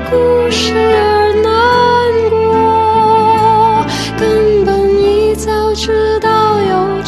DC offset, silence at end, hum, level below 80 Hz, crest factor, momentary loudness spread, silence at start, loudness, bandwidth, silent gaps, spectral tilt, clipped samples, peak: under 0.1%; 0 s; none; -30 dBFS; 10 dB; 4 LU; 0 s; -11 LUFS; 13 kHz; none; -5 dB/octave; under 0.1%; 0 dBFS